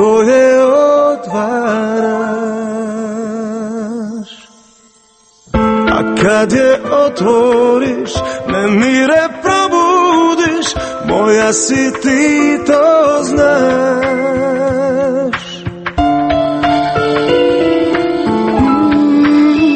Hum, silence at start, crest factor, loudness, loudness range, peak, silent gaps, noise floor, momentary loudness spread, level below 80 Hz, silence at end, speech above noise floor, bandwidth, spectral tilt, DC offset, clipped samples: none; 0 s; 12 dB; -12 LUFS; 7 LU; 0 dBFS; none; -48 dBFS; 10 LU; -36 dBFS; 0 s; 38 dB; 8.8 kHz; -4.5 dB/octave; under 0.1%; under 0.1%